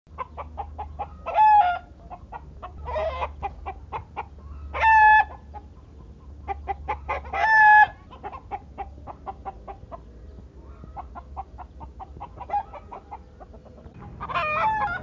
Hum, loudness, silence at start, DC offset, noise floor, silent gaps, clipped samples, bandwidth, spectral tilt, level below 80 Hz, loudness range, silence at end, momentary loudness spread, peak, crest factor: none; -20 LUFS; 0.1 s; under 0.1%; -45 dBFS; none; under 0.1%; 6.6 kHz; -5.5 dB/octave; -42 dBFS; 18 LU; 0 s; 26 LU; -6 dBFS; 20 dB